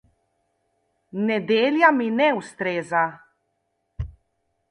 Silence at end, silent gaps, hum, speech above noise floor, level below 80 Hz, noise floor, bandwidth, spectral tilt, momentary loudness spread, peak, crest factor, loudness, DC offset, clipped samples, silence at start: 0.65 s; none; none; 53 dB; -48 dBFS; -74 dBFS; 11 kHz; -6 dB/octave; 19 LU; -4 dBFS; 22 dB; -21 LUFS; under 0.1%; under 0.1%; 1.15 s